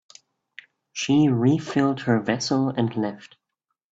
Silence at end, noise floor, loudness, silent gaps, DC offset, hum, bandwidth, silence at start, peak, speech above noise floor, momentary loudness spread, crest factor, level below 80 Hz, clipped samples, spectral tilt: 0.65 s; -81 dBFS; -23 LUFS; none; under 0.1%; none; 8 kHz; 0.95 s; -6 dBFS; 59 dB; 11 LU; 18 dB; -62 dBFS; under 0.1%; -6 dB/octave